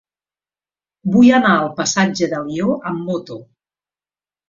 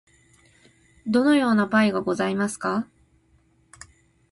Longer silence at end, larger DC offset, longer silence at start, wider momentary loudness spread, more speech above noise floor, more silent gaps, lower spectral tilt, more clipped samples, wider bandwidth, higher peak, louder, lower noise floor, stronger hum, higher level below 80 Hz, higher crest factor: second, 1.05 s vs 1.5 s; neither; about the same, 1.05 s vs 1.05 s; first, 15 LU vs 10 LU; first, over 74 dB vs 40 dB; neither; about the same, -5 dB/octave vs -5.5 dB/octave; neither; second, 7.6 kHz vs 11.5 kHz; first, -2 dBFS vs -8 dBFS; first, -16 LUFS vs -22 LUFS; first, under -90 dBFS vs -62 dBFS; first, 50 Hz at -50 dBFS vs none; first, -56 dBFS vs -62 dBFS; about the same, 16 dB vs 18 dB